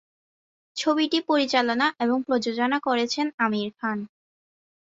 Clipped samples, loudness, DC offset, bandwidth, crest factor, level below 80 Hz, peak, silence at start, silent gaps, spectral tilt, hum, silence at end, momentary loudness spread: under 0.1%; -24 LUFS; under 0.1%; 7.8 kHz; 20 dB; -72 dBFS; -6 dBFS; 0.75 s; 3.34-3.38 s; -3.5 dB/octave; none; 0.85 s; 8 LU